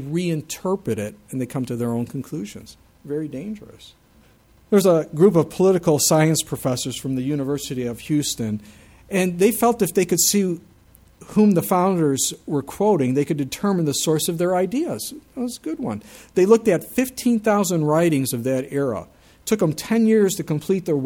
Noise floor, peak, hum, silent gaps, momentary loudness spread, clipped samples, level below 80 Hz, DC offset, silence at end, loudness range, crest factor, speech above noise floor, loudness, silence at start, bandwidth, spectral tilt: -54 dBFS; -2 dBFS; none; none; 13 LU; under 0.1%; -56 dBFS; under 0.1%; 0 s; 8 LU; 20 dB; 34 dB; -21 LUFS; 0 s; 18.5 kHz; -5 dB/octave